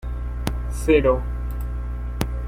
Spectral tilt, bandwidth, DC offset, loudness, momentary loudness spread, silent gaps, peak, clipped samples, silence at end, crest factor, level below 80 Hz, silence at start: -6.5 dB/octave; 16.5 kHz; under 0.1%; -24 LUFS; 12 LU; none; -2 dBFS; under 0.1%; 0 s; 20 dB; -26 dBFS; 0 s